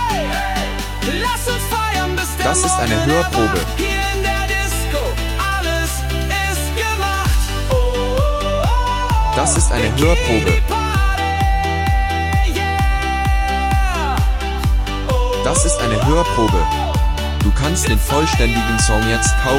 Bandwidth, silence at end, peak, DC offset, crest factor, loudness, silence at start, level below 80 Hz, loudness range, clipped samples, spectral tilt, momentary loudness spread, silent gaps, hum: 16.5 kHz; 0 s; -2 dBFS; under 0.1%; 14 dB; -17 LUFS; 0 s; -20 dBFS; 2 LU; under 0.1%; -4 dB/octave; 5 LU; none; none